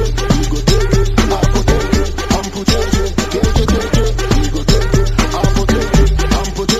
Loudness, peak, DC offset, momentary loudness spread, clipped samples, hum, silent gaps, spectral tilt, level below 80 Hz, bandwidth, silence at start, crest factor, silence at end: -15 LUFS; 0 dBFS; under 0.1%; 3 LU; under 0.1%; none; none; -5 dB/octave; -16 dBFS; 14.5 kHz; 0 s; 12 dB; 0 s